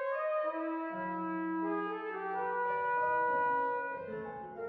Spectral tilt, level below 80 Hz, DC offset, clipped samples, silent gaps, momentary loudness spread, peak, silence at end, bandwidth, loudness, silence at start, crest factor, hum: -4.5 dB/octave; -74 dBFS; under 0.1%; under 0.1%; none; 8 LU; -24 dBFS; 0 s; 4.8 kHz; -35 LUFS; 0 s; 12 dB; none